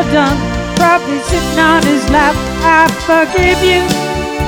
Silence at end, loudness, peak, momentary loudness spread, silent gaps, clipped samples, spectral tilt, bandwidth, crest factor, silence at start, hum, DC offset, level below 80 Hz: 0 s; -11 LUFS; 0 dBFS; 6 LU; none; under 0.1%; -4.5 dB/octave; 20 kHz; 12 dB; 0 s; none; under 0.1%; -24 dBFS